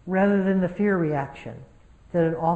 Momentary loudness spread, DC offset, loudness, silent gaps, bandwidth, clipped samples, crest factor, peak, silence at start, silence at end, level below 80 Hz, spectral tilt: 19 LU; under 0.1%; -23 LUFS; none; 4.3 kHz; under 0.1%; 14 dB; -10 dBFS; 0.05 s; 0 s; -52 dBFS; -9.5 dB/octave